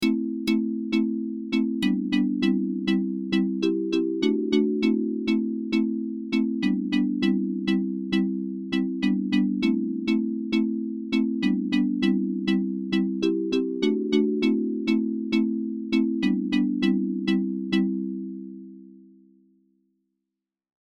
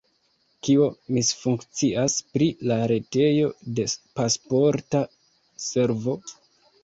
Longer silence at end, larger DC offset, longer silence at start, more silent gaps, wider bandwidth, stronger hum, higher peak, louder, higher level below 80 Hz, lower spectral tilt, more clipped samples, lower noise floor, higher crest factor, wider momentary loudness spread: first, 1.9 s vs 0.5 s; neither; second, 0 s vs 0.65 s; neither; first, 10.5 kHz vs 8 kHz; neither; about the same, -10 dBFS vs -8 dBFS; about the same, -25 LUFS vs -24 LUFS; about the same, -62 dBFS vs -60 dBFS; first, -7 dB/octave vs -5 dB/octave; neither; first, -85 dBFS vs -67 dBFS; about the same, 16 dB vs 16 dB; second, 4 LU vs 8 LU